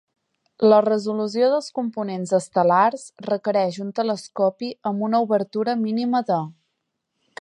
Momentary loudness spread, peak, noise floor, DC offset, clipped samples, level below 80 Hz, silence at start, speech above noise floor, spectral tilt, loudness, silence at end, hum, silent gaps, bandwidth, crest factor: 10 LU; -2 dBFS; -77 dBFS; under 0.1%; under 0.1%; -74 dBFS; 0.6 s; 56 dB; -6 dB/octave; -22 LUFS; 0.9 s; none; none; 11.5 kHz; 18 dB